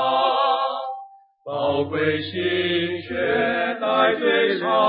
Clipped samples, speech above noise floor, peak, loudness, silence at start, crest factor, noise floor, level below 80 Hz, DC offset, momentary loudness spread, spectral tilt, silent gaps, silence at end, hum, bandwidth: under 0.1%; 22 dB; -6 dBFS; -21 LUFS; 0 s; 16 dB; -43 dBFS; -54 dBFS; under 0.1%; 10 LU; -9.5 dB/octave; none; 0 s; none; 5.2 kHz